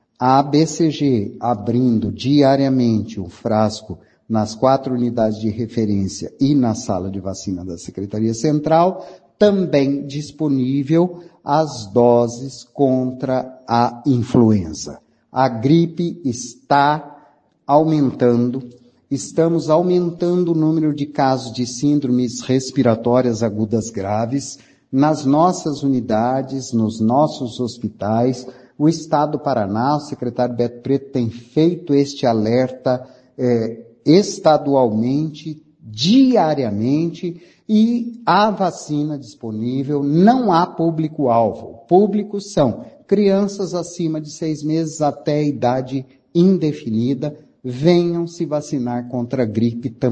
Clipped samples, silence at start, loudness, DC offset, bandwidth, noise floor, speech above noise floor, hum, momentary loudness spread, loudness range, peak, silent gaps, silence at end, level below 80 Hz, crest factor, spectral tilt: under 0.1%; 0.2 s; -18 LUFS; under 0.1%; 9.6 kHz; -53 dBFS; 35 dB; none; 11 LU; 3 LU; 0 dBFS; none; 0 s; -54 dBFS; 18 dB; -6.5 dB/octave